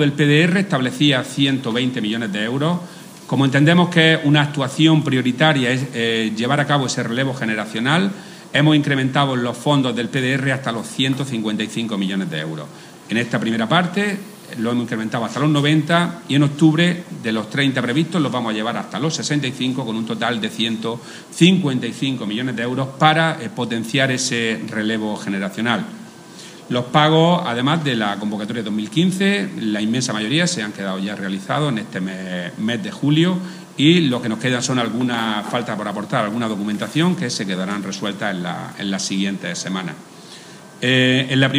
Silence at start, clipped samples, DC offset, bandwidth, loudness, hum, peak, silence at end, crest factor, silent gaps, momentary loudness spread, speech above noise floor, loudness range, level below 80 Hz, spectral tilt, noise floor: 0 s; under 0.1%; under 0.1%; 15.5 kHz; -19 LUFS; none; 0 dBFS; 0 s; 18 dB; none; 10 LU; 21 dB; 5 LU; -66 dBFS; -5 dB/octave; -39 dBFS